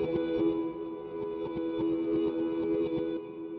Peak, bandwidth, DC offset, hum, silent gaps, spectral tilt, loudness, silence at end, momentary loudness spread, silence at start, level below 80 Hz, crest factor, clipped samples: -20 dBFS; 4.6 kHz; under 0.1%; none; none; -6.5 dB/octave; -32 LUFS; 0 s; 8 LU; 0 s; -60 dBFS; 12 dB; under 0.1%